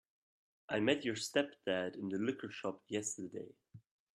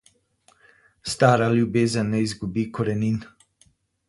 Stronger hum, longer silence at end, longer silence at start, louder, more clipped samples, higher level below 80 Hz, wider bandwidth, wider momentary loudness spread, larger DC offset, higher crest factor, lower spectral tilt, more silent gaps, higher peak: neither; second, 0.35 s vs 0.85 s; second, 0.7 s vs 1.05 s; second, -38 LUFS vs -23 LUFS; neither; second, -80 dBFS vs -54 dBFS; first, 13.5 kHz vs 11.5 kHz; about the same, 11 LU vs 11 LU; neither; about the same, 22 dB vs 22 dB; second, -3.5 dB/octave vs -6 dB/octave; neither; second, -18 dBFS vs -2 dBFS